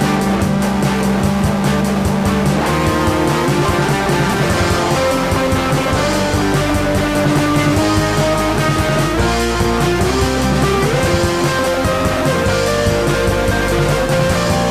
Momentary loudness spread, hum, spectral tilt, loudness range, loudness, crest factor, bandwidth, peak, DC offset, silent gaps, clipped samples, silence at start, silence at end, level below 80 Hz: 1 LU; none; -5 dB/octave; 0 LU; -15 LUFS; 12 dB; 16 kHz; -2 dBFS; under 0.1%; none; under 0.1%; 0 s; 0 s; -26 dBFS